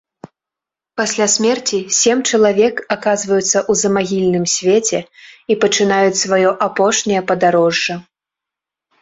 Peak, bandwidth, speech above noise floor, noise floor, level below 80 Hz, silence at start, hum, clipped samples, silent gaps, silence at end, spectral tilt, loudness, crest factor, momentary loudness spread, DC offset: 0 dBFS; 8.2 kHz; 71 dB; -86 dBFS; -58 dBFS; 0.25 s; none; under 0.1%; none; 1 s; -3 dB/octave; -15 LUFS; 16 dB; 7 LU; under 0.1%